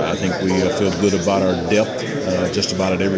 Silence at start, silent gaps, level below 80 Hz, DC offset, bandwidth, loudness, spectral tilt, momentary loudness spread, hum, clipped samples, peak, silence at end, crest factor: 0 s; none; -42 dBFS; under 0.1%; 8 kHz; -19 LUFS; -5 dB/octave; 3 LU; none; under 0.1%; -2 dBFS; 0 s; 16 dB